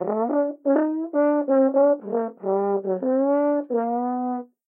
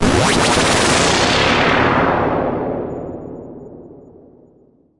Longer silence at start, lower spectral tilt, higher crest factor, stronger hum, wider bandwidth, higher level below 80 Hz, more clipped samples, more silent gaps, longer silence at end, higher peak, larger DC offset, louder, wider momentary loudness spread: about the same, 0 s vs 0 s; first, -12.5 dB/octave vs -3.5 dB/octave; about the same, 14 dB vs 16 dB; neither; second, 2.8 kHz vs 11.5 kHz; second, under -90 dBFS vs -36 dBFS; neither; neither; second, 0.25 s vs 1 s; second, -8 dBFS vs 0 dBFS; neither; second, -22 LUFS vs -14 LUFS; second, 6 LU vs 19 LU